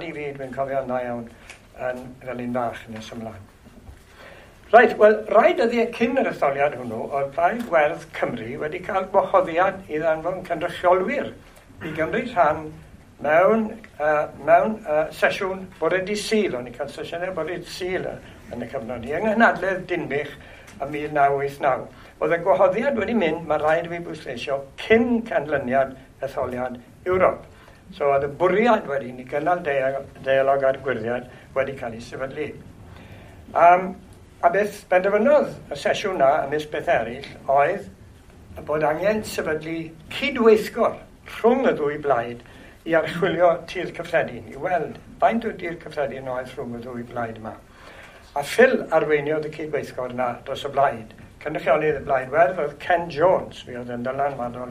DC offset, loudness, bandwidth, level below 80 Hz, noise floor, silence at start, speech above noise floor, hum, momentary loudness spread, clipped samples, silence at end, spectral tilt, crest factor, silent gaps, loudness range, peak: under 0.1%; -22 LUFS; 15.5 kHz; -52 dBFS; -46 dBFS; 0 s; 24 dB; none; 15 LU; under 0.1%; 0 s; -5.5 dB/octave; 22 dB; none; 6 LU; 0 dBFS